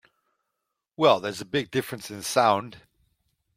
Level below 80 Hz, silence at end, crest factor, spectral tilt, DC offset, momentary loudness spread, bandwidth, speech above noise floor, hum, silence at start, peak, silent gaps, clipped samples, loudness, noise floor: -68 dBFS; 0.8 s; 22 dB; -4 dB/octave; under 0.1%; 12 LU; 16.5 kHz; 58 dB; none; 1 s; -6 dBFS; none; under 0.1%; -25 LUFS; -82 dBFS